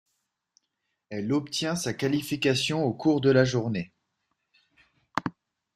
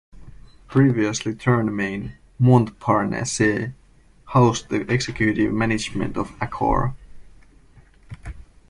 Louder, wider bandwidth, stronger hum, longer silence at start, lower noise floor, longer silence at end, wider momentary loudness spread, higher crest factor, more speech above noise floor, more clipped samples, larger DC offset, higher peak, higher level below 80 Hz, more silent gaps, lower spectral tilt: second, -26 LUFS vs -21 LUFS; first, 14.5 kHz vs 11.5 kHz; neither; first, 1.1 s vs 0.15 s; first, -80 dBFS vs -52 dBFS; first, 0.45 s vs 0.3 s; about the same, 13 LU vs 13 LU; about the same, 24 dB vs 20 dB; first, 55 dB vs 32 dB; neither; neither; about the same, -4 dBFS vs -2 dBFS; second, -62 dBFS vs -42 dBFS; neither; about the same, -5 dB/octave vs -6 dB/octave